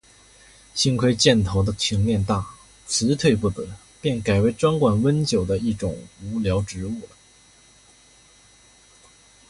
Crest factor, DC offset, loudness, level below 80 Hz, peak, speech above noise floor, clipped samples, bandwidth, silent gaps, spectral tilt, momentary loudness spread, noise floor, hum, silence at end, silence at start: 20 dB; under 0.1%; -22 LUFS; -42 dBFS; -4 dBFS; 32 dB; under 0.1%; 11.5 kHz; none; -5 dB/octave; 14 LU; -53 dBFS; none; 2.45 s; 0.75 s